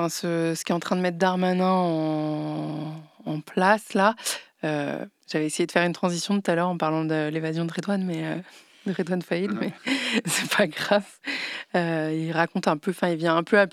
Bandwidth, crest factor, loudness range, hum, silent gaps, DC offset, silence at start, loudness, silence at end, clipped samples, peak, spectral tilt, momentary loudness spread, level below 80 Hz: 15 kHz; 22 dB; 2 LU; none; none; under 0.1%; 0 s; -25 LUFS; 0.05 s; under 0.1%; -4 dBFS; -5 dB/octave; 9 LU; -80 dBFS